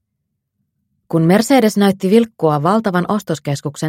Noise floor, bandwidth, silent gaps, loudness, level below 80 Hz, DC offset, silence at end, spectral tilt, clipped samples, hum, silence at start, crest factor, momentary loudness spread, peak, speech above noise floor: -74 dBFS; 16.5 kHz; none; -15 LUFS; -60 dBFS; under 0.1%; 0 s; -6 dB/octave; under 0.1%; none; 1.1 s; 16 dB; 9 LU; 0 dBFS; 59 dB